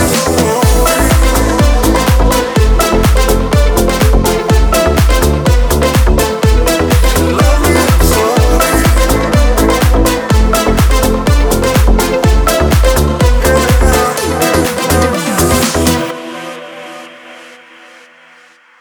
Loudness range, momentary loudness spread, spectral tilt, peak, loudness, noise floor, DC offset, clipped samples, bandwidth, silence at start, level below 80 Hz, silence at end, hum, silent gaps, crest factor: 3 LU; 2 LU; -5 dB/octave; 0 dBFS; -10 LUFS; -43 dBFS; under 0.1%; under 0.1%; over 20 kHz; 0 s; -14 dBFS; 1.35 s; none; none; 10 dB